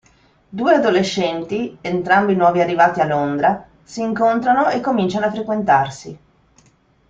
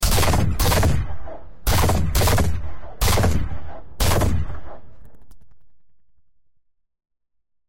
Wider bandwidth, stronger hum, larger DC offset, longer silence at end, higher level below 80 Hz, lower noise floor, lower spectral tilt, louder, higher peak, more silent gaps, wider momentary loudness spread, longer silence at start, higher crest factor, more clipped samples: second, 7.8 kHz vs 16.5 kHz; neither; neither; first, 0.95 s vs 0.35 s; second, -56 dBFS vs -26 dBFS; second, -56 dBFS vs -73 dBFS; first, -6 dB/octave vs -4.5 dB/octave; first, -17 LUFS vs -21 LUFS; first, -2 dBFS vs -8 dBFS; neither; second, 11 LU vs 18 LU; first, 0.5 s vs 0 s; about the same, 16 dB vs 14 dB; neither